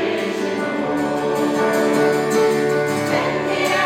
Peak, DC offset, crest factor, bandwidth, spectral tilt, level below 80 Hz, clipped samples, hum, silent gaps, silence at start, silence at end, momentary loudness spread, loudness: -6 dBFS; under 0.1%; 12 dB; 16.5 kHz; -4.5 dB/octave; -56 dBFS; under 0.1%; none; none; 0 s; 0 s; 5 LU; -19 LUFS